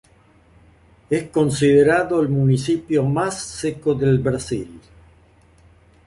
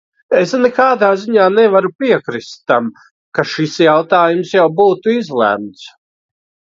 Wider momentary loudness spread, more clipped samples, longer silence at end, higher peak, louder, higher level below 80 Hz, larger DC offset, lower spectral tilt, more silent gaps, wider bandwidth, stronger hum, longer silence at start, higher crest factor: about the same, 11 LU vs 10 LU; neither; first, 1.3 s vs 0.85 s; second, -4 dBFS vs 0 dBFS; second, -19 LUFS vs -13 LUFS; first, -48 dBFS vs -62 dBFS; neither; about the same, -6.5 dB/octave vs -5.5 dB/octave; second, none vs 1.95-1.99 s, 3.11-3.32 s; first, 11.5 kHz vs 7.6 kHz; neither; first, 1.1 s vs 0.3 s; about the same, 16 dB vs 14 dB